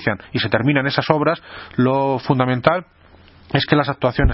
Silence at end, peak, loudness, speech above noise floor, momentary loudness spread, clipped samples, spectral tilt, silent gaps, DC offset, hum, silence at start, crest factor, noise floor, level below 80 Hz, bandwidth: 0 s; 0 dBFS; -19 LUFS; 29 dB; 6 LU; under 0.1%; -9.5 dB/octave; none; under 0.1%; none; 0 s; 18 dB; -47 dBFS; -32 dBFS; 5.8 kHz